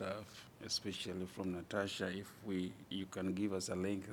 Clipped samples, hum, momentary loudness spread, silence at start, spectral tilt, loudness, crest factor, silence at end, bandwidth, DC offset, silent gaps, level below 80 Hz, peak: under 0.1%; none; 7 LU; 0 s; -4.5 dB/octave; -42 LUFS; 18 dB; 0 s; 19 kHz; under 0.1%; none; -76 dBFS; -24 dBFS